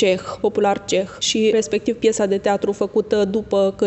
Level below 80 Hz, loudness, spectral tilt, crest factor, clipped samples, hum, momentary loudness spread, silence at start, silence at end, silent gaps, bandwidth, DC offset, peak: -52 dBFS; -19 LUFS; -4 dB/octave; 14 dB; under 0.1%; none; 4 LU; 0 s; 0 s; none; 8.4 kHz; under 0.1%; -4 dBFS